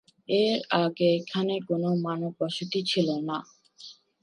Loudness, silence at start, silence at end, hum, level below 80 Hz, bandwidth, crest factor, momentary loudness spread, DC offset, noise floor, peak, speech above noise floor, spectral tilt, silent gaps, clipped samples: -27 LUFS; 0.3 s; 0.3 s; none; -76 dBFS; 11 kHz; 20 dB; 14 LU; under 0.1%; -50 dBFS; -8 dBFS; 24 dB; -6 dB/octave; none; under 0.1%